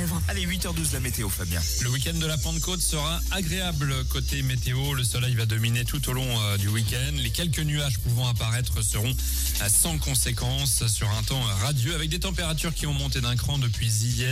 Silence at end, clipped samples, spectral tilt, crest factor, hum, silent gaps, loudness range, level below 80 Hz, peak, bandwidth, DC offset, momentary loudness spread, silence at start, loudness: 0 s; under 0.1%; -3.5 dB/octave; 14 dB; none; none; 2 LU; -32 dBFS; -10 dBFS; 16 kHz; under 0.1%; 4 LU; 0 s; -25 LUFS